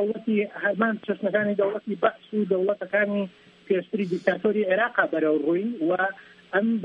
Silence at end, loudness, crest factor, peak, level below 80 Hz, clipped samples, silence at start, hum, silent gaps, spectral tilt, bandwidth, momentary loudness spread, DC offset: 0 s; -25 LUFS; 20 dB; -6 dBFS; -74 dBFS; under 0.1%; 0 s; none; none; -8 dB/octave; 5.6 kHz; 5 LU; under 0.1%